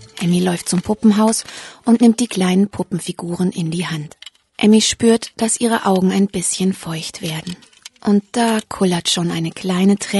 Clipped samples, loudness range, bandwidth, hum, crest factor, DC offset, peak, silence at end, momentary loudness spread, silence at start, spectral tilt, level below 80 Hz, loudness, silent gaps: under 0.1%; 3 LU; 12 kHz; none; 16 dB; under 0.1%; -2 dBFS; 0 s; 12 LU; 0 s; -4.5 dB/octave; -52 dBFS; -17 LUFS; none